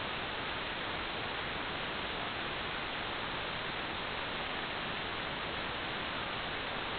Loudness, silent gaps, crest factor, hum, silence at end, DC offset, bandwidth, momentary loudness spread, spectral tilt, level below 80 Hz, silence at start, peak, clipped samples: -37 LUFS; none; 16 dB; none; 0 s; under 0.1%; 4.9 kHz; 0 LU; -1 dB/octave; -56 dBFS; 0 s; -22 dBFS; under 0.1%